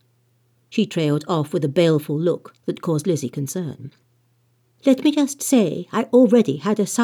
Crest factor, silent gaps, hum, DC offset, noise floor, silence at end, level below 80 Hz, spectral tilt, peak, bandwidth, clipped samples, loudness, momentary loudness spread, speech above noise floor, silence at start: 16 dB; none; none; under 0.1%; -63 dBFS; 0 s; -76 dBFS; -6 dB/octave; -4 dBFS; 18 kHz; under 0.1%; -20 LUFS; 11 LU; 43 dB; 0.7 s